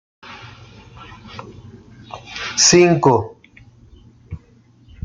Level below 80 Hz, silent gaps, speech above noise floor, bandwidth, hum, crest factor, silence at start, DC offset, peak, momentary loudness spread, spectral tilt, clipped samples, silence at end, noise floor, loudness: -50 dBFS; none; 35 dB; 9.6 kHz; none; 20 dB; 0.25 s; under 0.1%; -2 dBFS; 28 LU; -3.5 dB/octave; under 0.1%; 0.65 s; -51 dBFS; -14 LUFS